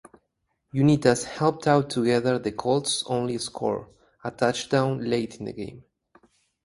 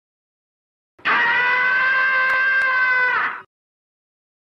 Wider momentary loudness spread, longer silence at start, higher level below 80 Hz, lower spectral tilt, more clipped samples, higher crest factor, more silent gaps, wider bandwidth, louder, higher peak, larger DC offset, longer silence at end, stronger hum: first, 14 LU vs 7 LU; second, 0.75 s vs 1.05 s; first, -60 dBFS vs -70 dBFS; first, -5.5 dB/octave vs -2.5 dB/octave; neither; first, 22 dB vs 12 dB; neither; first, 11.5 kHz vs 6.8 kHz; second, -25 LUFS vs -17 LUFS; first, -4 dBFS vs -8 dBFS; neither; second, 0.85 s vs 1.1 s; neither